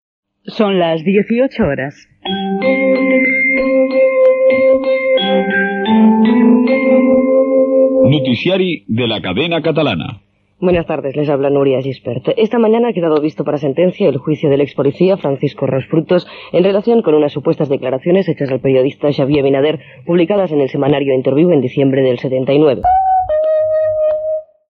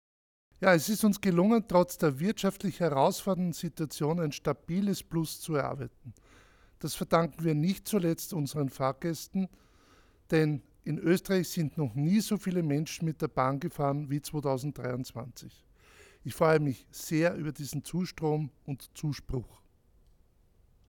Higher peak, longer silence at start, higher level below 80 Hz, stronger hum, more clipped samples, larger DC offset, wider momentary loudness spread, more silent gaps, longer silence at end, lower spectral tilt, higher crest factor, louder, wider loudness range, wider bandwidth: first, 0 dBFS vs -10 dBFS; second, 0.45 s vs 0.6 s; first, -46 dBFS vs -58 dBFS; neither; neither; neither; second, 7 LU vs 12 LU; neither; second, 0.25 s vs 1.4 s; first, -9 dB/octave vs -6 dB/octave; second, 12 dB vs 22 dB; first, -13 LUFS vs -30 LUFS; about the same, 4 LU vs 6 LU; second, 5.8 kHz vs 19 kHz